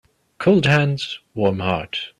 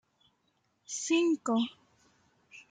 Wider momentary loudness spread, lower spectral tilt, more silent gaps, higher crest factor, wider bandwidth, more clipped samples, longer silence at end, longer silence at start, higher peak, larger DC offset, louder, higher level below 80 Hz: about the same, 10 LU vs 10 LU; first, -6.5 dB/octave vs -3 dB/octave; neither; about the same, 18 dB vs 18 dB; first, 11 kHz vs 9.4 kHz; neither; about the same, 0.1 s vs 0.1 s; second, 0.4 s vs 0.9 s; first, -2 dBFS vs -16 dBFS; neither; first, -19 LUFS vs -31 LUFS; first, -52 dBFS vs -84 dBFS